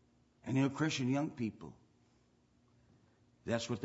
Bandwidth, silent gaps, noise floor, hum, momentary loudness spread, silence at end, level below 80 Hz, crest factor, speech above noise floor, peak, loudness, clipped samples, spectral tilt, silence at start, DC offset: 7.6 kHz; none; -71 dBFS; none; 17 LU; 0 s; -74 dBFS; 18 dB; 35 dB; -20 dBFS; -36 LUFS; under 0.1%; -5.5 dB/octave; 0.45 s; under 0.1%